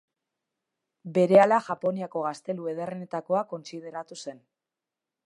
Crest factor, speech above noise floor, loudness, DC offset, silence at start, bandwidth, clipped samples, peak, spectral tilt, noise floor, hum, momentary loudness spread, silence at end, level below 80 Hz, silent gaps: 22 dB; 63 dB; -26 LUFS; under 0.1%; 1.05 s; 11 kHz; under 0.1%; -6 dBFS; -6.5 dB/octave; -89 dBFS; none; 20 LU; 0.9 s; -80 dBFS; none